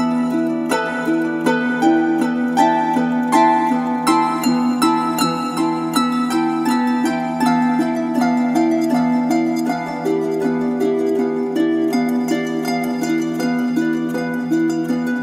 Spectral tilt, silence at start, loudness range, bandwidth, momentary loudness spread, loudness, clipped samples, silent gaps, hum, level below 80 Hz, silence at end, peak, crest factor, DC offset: -5 dB/octave; 0 s; 3 LU; 15.5 kHz; 4 LU; -18 LUFS; under 0.1%; none; none; -62 dBFS; 0 s; -2 dBFS; 16 dB; under 0.1%